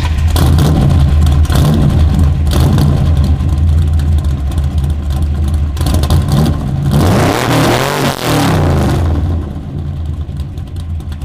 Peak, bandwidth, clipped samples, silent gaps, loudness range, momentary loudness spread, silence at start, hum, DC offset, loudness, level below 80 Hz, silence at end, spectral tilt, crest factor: 0 dBFS; 16 kHz; under 0.1%; none; 3 LU; 11 LU; 0 s; none; under 0.1%; -12 LUFS; -16 dBFS; 0 s; -6.5 dB/octave; 10 dB